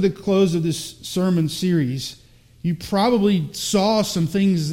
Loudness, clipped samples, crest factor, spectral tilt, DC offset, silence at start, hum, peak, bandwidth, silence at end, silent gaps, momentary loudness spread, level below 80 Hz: -21 LUFS; under 0.1%; 14 dB; -6 dB/octave; under 0.1%; 0 s; none; -6 dBFS; 16.5 kHz; 0 s; none; 9 LU; -50 dBFS